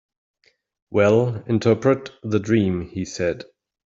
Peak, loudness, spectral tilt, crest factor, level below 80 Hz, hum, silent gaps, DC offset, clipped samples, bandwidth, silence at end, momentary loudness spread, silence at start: -4 dBFS; -21 LUFS; -7 dB/octave; 18 dB; -56 dBFS; none; none; under 0.1%; under 0.1%; 7.8 kHz; 0.55 s; 9 LU; 0.9 s